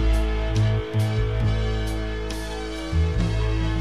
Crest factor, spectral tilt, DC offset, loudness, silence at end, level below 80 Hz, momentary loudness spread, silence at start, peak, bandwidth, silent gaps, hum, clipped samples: 10 dB; -6.5 dB/octave; 0.7%; -25 LUFS; 0 s; -26 dBFS; 7 LU; 0 s; -12 dBFS; 12 kHz; none; none; under 0.1%